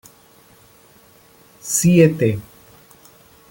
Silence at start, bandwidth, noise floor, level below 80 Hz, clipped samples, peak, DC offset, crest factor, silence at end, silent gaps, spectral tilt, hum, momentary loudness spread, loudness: 1.65 s; 17 kHz; -50 dBFS; -54 dBFS; under 0.1%; -2 dBFS; under 0.1%; 20 dB; 1.1 s; none; -5.5 dB/octave; none; 17 LU; -16 LUFS